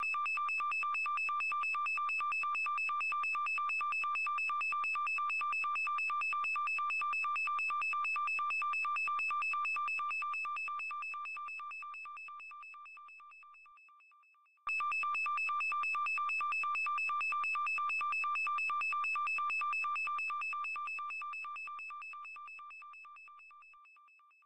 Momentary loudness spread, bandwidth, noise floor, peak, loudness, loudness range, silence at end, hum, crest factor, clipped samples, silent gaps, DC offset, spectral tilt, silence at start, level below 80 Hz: 13 LU; 14 kHz; -68 dBFS; -30 dBFS; -34 LUFS; 9 LU; 0 s; none; 8 dB; under 0.1%; none; 0.1%; 1.5 dB/octave; 0 s; -86 dBFS